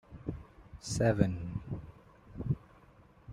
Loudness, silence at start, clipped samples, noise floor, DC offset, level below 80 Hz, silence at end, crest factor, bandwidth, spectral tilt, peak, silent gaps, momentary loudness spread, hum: -35 LUFS; 0.1 s; under 0.1%; -60 dBFS; under 0.1%; -52 dBFS; 0 s; 26 dB; 12.5 kHz; -6.5 dB/octave; -10 dBFS; none; 22 LU; none